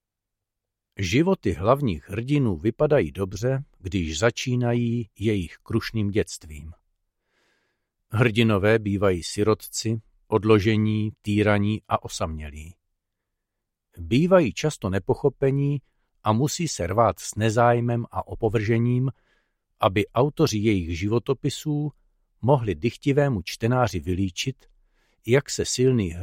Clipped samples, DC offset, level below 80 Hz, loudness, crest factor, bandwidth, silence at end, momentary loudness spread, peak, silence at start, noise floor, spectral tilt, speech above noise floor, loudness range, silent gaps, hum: under 0.1%; under 0.1%; -46 dBFS; -24 LUFS; 20 dB; 16 kHz; 0 s; 10 LU; -4 dBFS; 1 s; -85 dBFS; -6 dB/octave; 62 dB; 3 LU; none; none